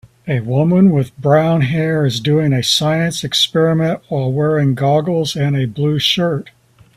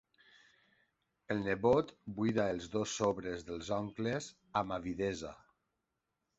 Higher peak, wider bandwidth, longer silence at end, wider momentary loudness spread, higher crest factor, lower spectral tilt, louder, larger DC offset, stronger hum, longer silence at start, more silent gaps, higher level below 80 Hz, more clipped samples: first, 0 dBFS vs -16 dBFS; first, 15 kHz vs 8 kHz; second, 0.45 s vs 1.05 s; second, 6 LU vs 10 LU; second, 14 dB vs 22 dB; about the same, -5.5 dB/octave vs -5 dB/octave; first, -15 LUFS vs -36 LUFS; neither; neither; second, 0.25 s vs 1.3 s; neither; first, -50 dBFS vs -62 dBFS; neither